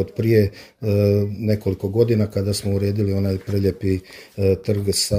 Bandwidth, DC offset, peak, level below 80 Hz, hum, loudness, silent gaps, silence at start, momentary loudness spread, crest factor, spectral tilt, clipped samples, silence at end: 16 kHz; under 0.1%; -4 dBFS; -48 dBFS; none; -21 LUFS; none; 0 s; 6 LU; 16 dB; -6 dB/octave; under 0.1%; 0 s